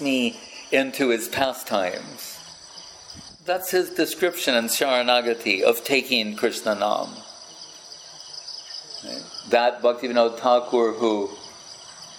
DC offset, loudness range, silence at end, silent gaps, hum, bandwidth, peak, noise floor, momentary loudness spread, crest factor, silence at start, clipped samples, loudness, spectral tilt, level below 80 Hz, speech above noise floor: under 0.1%; 6 LU; 0 s; none; none; 17 kHz; -4 dBFS; -43 dBFS; 20 LU; 20 dB; 0 s; under 0.1%; -22 LUFS; -2.5 dB/octave; -68 dBFS; 21 dB